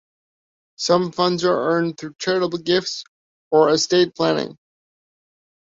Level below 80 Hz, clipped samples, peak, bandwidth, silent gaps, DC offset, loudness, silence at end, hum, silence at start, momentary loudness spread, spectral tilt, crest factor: -64 dBFS; under 0.1%; -4 dBFS; 7.8 kHz; 3.08-3.51 s; under 0.1%; -20 LUFS; 1.2 s; none; 0.8 s; 11 LU; -4.5 dB/octave; 18 dB